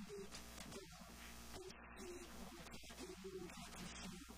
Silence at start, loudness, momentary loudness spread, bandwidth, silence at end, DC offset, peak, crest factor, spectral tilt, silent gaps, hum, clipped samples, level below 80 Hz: 0 s; -54 LUFS; 3 LU; 15.5 kHz; 0 s; under 0.1%; -38 dBFS; 16 dB; -3.5 dB/octave; none; none; under 0.1%; -64 dBFS